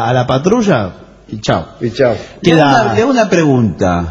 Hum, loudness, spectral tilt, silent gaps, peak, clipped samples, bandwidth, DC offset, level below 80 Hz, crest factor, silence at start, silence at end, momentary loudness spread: none; -12 LUFS; -6 dB/octave; none; 0 dBFS; 0.2%; 8 kHz; under 0.1%; -40 dBFS; 12 dB; 0 s; 0 s; 9 LU